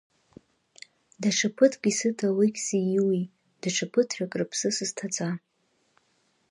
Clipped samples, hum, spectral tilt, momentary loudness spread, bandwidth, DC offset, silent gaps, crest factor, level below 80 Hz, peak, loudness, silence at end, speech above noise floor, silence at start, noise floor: under 0.1%; none; -4 dB/octave; 8 LU; 11.5 kHz; under 0.1%; none; 22 dB; -76 dBFS; -6 dBFS; -26 LUFS; 1.15 s; 44 dB; 1.2 s; -70 dBFS